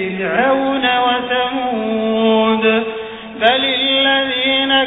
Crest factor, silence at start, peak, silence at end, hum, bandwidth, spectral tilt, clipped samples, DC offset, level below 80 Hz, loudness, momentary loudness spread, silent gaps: 16 dB; 0 s; 0 dBFS; 0 s; none; 4 kHz; -7 dB/octave; under 0.1%; under 0.1%; -52 dBFS; -15 LUFS; 6 LU; none